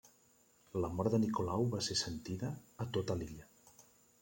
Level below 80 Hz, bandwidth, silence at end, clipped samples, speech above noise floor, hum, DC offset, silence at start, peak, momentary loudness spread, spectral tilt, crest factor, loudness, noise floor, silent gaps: -64 dBFS; 16.5 kHz; 0.5 s; under 0.1%; 32 dB; none; under 0.1%; 0.05 s; -20 dBFS; 10 LU; -5.5 dB/octave; 20 dB; -38 LUFS; -69 dBFS; none